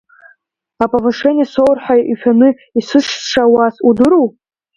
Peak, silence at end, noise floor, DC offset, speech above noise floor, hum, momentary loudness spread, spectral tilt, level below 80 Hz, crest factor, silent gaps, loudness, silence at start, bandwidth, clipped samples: 0 dBFS; 0.45 s; -55 dBFS; under 0.1%; 44 dB; none; 6 LU; -5 dB/octave; -50 dBFS; 12 dB; none; -12 LUFS; 0.8 s; 8 kHz; under 0.1%